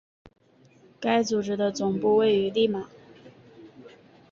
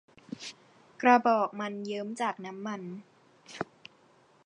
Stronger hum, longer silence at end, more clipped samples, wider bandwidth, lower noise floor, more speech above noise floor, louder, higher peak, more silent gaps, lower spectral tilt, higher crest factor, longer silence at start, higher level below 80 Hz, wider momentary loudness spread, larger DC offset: neither; second, 0.45 s vs 0.8 s; neither; second, 7.4 kHz vs 10.5 kHz; second, -58 dBFS vs -63 dBFS; about the same, 34 dB vs 34 dB; first, -25 LUFS vs -30 LUFS; second, -12 dBFS vs -8 dBFS; neither; about the same, -5 dB/octave vs -5 dB/octave; second, 16 dB vs 22 dB; first, 1 s vs 0.3 s; first, -66 dBFS vs -82 dBFS; second, 10 LU vs 21 LU; neither